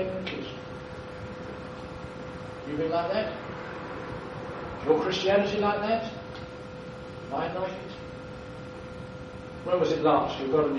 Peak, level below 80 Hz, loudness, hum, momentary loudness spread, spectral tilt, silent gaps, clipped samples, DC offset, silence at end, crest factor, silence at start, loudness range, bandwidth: -8 dBFS; -54 dBFS; -30 LUFS; none; 16 LU; -6 dB/octave; none; under 0.1%; under 0.1%; 0 s; 22 dB; 0 s; 7 LU; 9.2 kHz